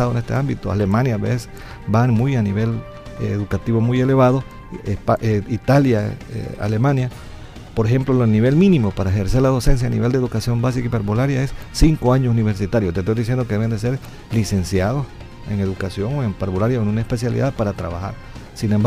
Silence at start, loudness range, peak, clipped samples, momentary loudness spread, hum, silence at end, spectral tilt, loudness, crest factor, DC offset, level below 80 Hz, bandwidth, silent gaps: 0 s; 4 LU; -2 dBFS; under 0.1%; 13 LU; none; 0 s; -7.5 dB/octave; -19 LUFS; 16 dB; under 0.1%; -32 dBFS; 14.5 kHz; none